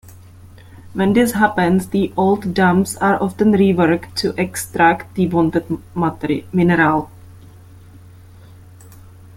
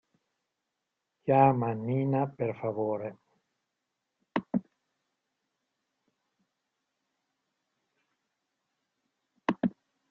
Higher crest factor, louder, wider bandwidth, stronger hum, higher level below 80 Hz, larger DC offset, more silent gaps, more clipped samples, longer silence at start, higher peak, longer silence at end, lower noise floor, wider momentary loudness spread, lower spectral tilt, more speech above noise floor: second, 16 dB vs 24 dB; first, -17 LUFS vs -30 LUFS; first, 16 kHz vs 6.4 kHz; neither; first, -46 dBFS vs -72 dBFS; neither; neither; neither; second, 0.75 s vs 1.25 s; first, -2 dBFS vs -10 dBFS; first, 2.05 s vs 0.4 s; second, -41 dBFS vs -85 dBFS; second, 8 LU vs 13 LU; second, -6 dB/octave vs -10 dB/octave; second, 25 dB vs 57 dB